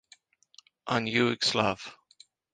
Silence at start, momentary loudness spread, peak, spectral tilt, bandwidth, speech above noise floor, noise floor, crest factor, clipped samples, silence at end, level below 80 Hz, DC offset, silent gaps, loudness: 0.85 s; 18 LU; -10 dBFS; -4 dB/octave; 9.6 kHz; 33 dB; -61 dBFS; 22 dB; under 0.1%; 0.6 s; -66 dBFS; under 0.1%; none; -27 LUFS